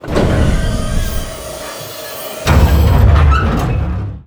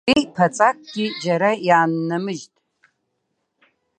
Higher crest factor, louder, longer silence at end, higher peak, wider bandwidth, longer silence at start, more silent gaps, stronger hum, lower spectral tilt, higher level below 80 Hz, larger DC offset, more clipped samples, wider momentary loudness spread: second, 12 dB vs 20 dB; first, -14 LUFS vs -19 LUFS; second, 0.05 s vs 1.55 s; about the same, 0 dBFS vs -2 dBFS; first, over 20 kHz vs 9.8 kHz; about the same, 0.05 s vs 0.05 s; neither; neither; about the same, -6 dB/octave vs -5 dB/octave; first, -16 dBFS vs -60 dBFS; neither; neither; first, 15 LU vs 9 LU